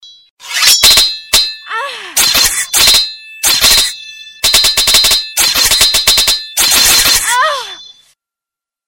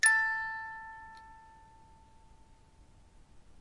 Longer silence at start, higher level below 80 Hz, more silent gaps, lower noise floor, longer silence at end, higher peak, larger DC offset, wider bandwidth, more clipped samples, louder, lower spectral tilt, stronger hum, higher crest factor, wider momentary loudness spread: about the same, 0.05 s vs 0.05 s; first, -34 dBFS vs -62 dBFS; first, 0.30-0.37 s vs none; first, -86 dBFS vs -60 dBFS; first, 1.05 s vs 0.2 s; first, 0 dBFS vs -12 dBFS; neither; first, over 20 kHz vs 11.5 kHz; first, 0.4% vs under 0.1%; first, -7 LUFS vs -31 LUFS; about the same, 1.5 dB/octave vs 1.5 dB/octave; neither; second, 12 dB vs 24 dB; second, 13 LU vs 27 LU